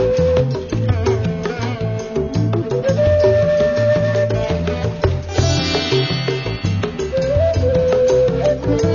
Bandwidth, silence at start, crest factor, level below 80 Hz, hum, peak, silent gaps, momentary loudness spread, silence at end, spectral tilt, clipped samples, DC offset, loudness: 7.2 kHz; 0 s; 14 dB; -32 dBFS; none; -4 dBFS; none; 7 LU; 0 s; -6.5 dB/octave; under 0.1%; under 0.1%; -17 LUFS